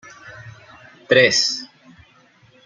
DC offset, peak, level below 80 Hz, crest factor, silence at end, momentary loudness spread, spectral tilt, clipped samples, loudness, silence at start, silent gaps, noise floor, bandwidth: under 0.1%; -2 dBFS; -62 dBFS; 22 dB; 1 s; 27 LU; -2 dB/octave; under 0.1%; -16 LUFS; 0.25 s; none; -54 dBFS; 9.4 kHz